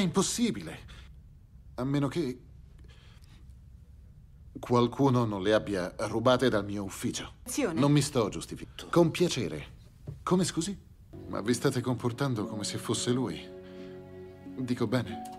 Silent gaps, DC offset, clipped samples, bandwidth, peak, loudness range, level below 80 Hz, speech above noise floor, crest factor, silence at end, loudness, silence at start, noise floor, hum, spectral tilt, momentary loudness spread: none; under 0.1%; under 0.1%; 15.5 kHz; -10 dBFS; 8 LU; -54 dBFS; 23 dB; 20 dB; 0 s; -30 LUFS; 0 s; -52 dBFS; none; -5.5 dB/octave; 20 LU